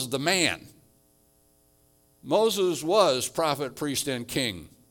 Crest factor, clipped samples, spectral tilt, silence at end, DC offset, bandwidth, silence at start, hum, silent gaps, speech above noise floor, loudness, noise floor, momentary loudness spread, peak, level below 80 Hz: 22 dB; under 0.1%; -3 dB/octave; 0.25 s; under 0.1%; 18 kHz; 0 s; none; none; 38 dB; -25 LUFS; -63 dBFS; 8 LU; -6 dBFS; -64 dBFS